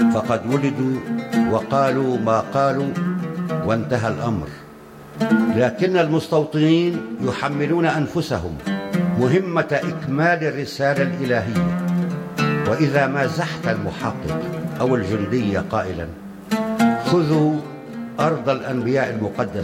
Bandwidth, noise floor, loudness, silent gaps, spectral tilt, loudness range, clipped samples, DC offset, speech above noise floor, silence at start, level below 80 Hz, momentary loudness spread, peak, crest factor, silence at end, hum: 15.5 kHz; -40 dBFS; -21 LUFS; none; -7 dB/octave; 2 LU; under 0.1%; under 0.1%; 20 dB; 0 s; -50 dBFS; 8 LU; -4 dBFS; 16 dB; 0 s; none